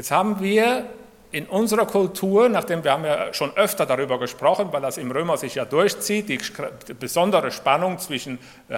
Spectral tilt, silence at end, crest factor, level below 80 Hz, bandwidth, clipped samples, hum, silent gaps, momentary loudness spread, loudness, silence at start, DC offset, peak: -4 dB/octave; 0 s; 20 dB; -62 dBFS; 17.5 kHz; under 0.1%; none; none; 11 LU; -22 LUFS; 0 s; under 0.1%; -2 dBFS